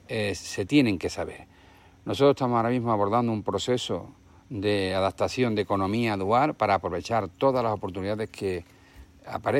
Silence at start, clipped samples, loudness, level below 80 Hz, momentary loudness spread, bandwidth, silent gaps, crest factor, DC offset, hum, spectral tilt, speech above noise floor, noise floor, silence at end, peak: 0.1 s; under 0.1%; -26 LUFS; -56 dBFS; 11 LU; 16 kHz; none; 18 dB; under 0.1%; none; -6 dB/octave; 28 dB; -54 dBFS; 0 s; -8 dBFS